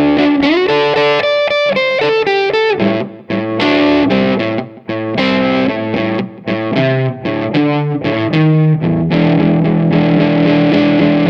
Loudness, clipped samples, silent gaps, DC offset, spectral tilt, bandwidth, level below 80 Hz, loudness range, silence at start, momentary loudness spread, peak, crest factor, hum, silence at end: -13 LUFS; under 0.1%; none; under 0.1%; -8 dB/octave; 6.8 kHz; -44 dBFS; 3 LU; 0 s; 8 LU; 0 dBFS; 12 dB; none; 0 s